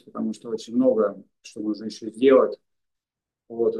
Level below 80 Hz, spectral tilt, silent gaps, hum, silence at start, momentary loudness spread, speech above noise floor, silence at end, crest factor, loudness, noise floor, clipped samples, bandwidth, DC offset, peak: -78 dBFS; -6 dB/octave; none; none; 0.15 s; 21 LU; 66 dB; 0 s; 20 dB; -23 LUFS; -89 dBFS; under 0.1%; 10 kHz; under 0.1%; -4 dBFS